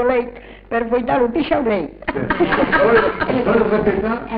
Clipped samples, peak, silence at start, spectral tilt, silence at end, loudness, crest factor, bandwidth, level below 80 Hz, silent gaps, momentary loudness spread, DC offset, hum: under 0.1%; -4 dBFS; 0 s; -10.5 dB/octave; 0 s; -17 LUFS; 14 dB; 5.2 kHz; -38 dBFS; none; 9 LU; under 0.1%; none